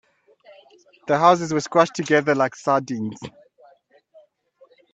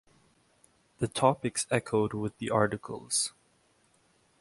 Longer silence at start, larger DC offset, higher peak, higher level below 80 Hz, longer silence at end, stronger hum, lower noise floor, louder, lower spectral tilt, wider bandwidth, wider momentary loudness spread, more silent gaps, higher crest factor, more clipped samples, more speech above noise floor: about the same, 1.05 s vs 1 s; neither; first, -2 dBFS vs -8 dBFS; about the same, -66 dBFS vs -62 dBFS; first, 1.65 s vs 1.1 s; neither; second, -57 dBFS vs -68 dBFS; first, -20 LUFS vs -30 LUFS; about the same, -5 dB/octave vs -4 dB/octave; second, 8.6 kHz vs 11.5 kHz; first, 18 LU vs 8 LU; neither; about the same, 22 dB vs 24 dB; neither; about the same, 36 dB vs 39 dB